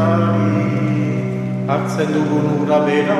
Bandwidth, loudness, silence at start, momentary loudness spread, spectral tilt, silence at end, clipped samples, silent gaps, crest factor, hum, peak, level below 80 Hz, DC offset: 12 kHz; -17 LUFS; 0 s; 5 LU; -8 dB/octave; 0 s; under 0.1%; none; 14 dB; none; -2 dBFS; -54 dBFS; under 0.1%